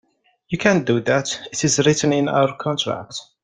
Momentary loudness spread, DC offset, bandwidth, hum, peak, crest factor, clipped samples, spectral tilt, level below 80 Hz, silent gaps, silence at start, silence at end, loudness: 9 LU; under 0.1%; 10 kHz; none; 0 dBFS; 20 dB; under 0.1%; -4 dB/octave; -56 dBFS; none; 0.5 s; 0.2 s; -19 LUFS